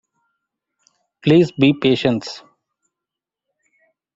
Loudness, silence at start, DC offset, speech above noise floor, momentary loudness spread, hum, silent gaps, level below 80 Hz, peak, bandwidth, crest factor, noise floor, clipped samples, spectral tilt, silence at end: -16 LUFS; 1.25 s; under 0.1%; 70 dB; 15 LU; none; none; -58 dBFS; -2 dBFS; 7.8 kHz; 18 dB; -85 dBFS; under 0.1%; -7 dB/octave; 1.75 s